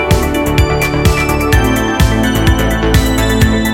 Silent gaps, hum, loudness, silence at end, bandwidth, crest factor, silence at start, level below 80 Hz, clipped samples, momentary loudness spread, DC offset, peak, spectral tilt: none; none; -12 LUFS; 0 s; 17 kHz; 10 dB; 0 s; -16 dBFS; under 0.1%; 1 LU; under 0.1%; 0 dBFS; -5.5 dB/octave